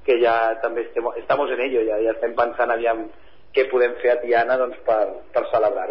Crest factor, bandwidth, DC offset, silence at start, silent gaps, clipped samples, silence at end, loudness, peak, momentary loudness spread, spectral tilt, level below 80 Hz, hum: 14 dB; 5.6 kHz; 0.8%; 0.05 s; none; under 0.1%; 0 s; -21 LUFS; -6 dBFS; 7 LU; -9 dB/octave; -58 dBFS; none